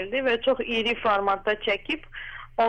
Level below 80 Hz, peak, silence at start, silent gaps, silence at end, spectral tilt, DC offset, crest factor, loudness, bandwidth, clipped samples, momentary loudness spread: -48 dBFS; -12 dBFS; 0 s; none; 0 s; -4.5 dB/octave; under 0.1%; 14 dB; -25 LUFS; 9 kHz; under 0.1%; 10 LU